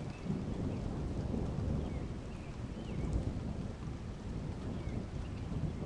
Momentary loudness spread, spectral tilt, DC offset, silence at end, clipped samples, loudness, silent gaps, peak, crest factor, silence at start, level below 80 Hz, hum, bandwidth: 6 LU; -8 dB/octave; under 0.1%; 0 s; under 0.1%; -40 LUFS; none; -22 dBFS; 16 dB; 0 s; -44 dBFS; none; 11 kHz